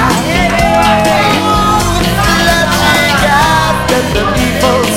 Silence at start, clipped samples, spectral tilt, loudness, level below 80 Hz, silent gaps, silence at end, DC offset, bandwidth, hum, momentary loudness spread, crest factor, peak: 0 s; 0.1%; -4 dB/octave; -9 LUFS; -22 dBFS; none; 0 s; under 0.1%; 17 kHz; none; 3 LU; 10 dB; 0 dBFS